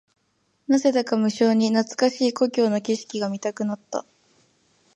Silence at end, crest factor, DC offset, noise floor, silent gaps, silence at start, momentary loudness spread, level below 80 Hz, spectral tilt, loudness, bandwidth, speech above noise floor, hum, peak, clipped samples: 0.95 s; 18 dB; under 0.1%; -69 dBFS; none; 0.7 s; 10 LU; -76 dBFS; -5 dB/octave; -23 LUFS; 10.5 kHz; 47 dB; none; -6 dBFS; under 0.1%